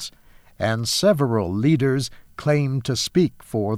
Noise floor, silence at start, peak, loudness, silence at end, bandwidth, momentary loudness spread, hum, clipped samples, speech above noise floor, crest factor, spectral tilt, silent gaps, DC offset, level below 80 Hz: -50 dBFS; 0 s; -4 dBFS; -21 LUFS; 0 s; 15.5 kHz; 8 LU; none; under 0.1%; 29 dB; 16 dB; -5.5 dB/octave; none; under 0.1%; -52 dBFS